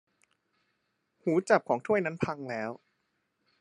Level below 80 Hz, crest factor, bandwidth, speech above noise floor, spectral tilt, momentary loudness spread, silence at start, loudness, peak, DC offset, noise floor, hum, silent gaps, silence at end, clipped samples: -74 dBFS; 26 dB; 11 kHz; 49 dB; -6.5 dB/octave; 11 LU; 1.25 s; -30 LUFS; -8 dBFS; under 0.1%; -78 dBFS; none; none; 0.85 s; under 0.1%